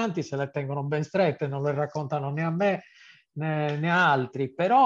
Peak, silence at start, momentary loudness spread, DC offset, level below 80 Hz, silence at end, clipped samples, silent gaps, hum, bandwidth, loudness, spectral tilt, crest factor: -10 dBFS; 0 s; 8 LU; under 0.1%; -72 dBFS; 0 s; under 0.1%; none; none; 7.4 kHz; -27 LUFS; -7 dB/octave; 16 dB